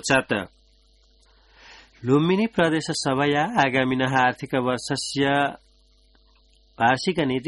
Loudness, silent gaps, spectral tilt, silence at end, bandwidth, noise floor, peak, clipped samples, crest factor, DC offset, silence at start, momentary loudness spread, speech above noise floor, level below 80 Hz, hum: -22 LUFS; none; -5 dB/octave; 0 s; 11.5 kHz; -58 dBFS; -4 dBFS; under 0.1%; 20 dB; under 0.1%; 0.05 s; 6 LU; 36 dB; -56 dBFS; none